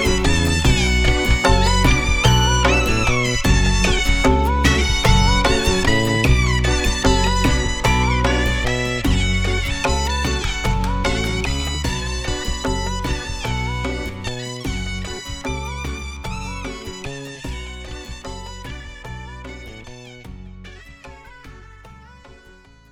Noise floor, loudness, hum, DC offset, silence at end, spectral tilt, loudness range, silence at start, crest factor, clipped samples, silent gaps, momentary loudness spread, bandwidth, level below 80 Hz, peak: -47 dBFS; -19 LUFS; none; under 0.1%; 0.6 s; -4 dB/octave; 18 LU; 0 s; 18 dB; under 0.1%; none; 18 LU; 18 kHz; -24 dBFS; 0 dBFS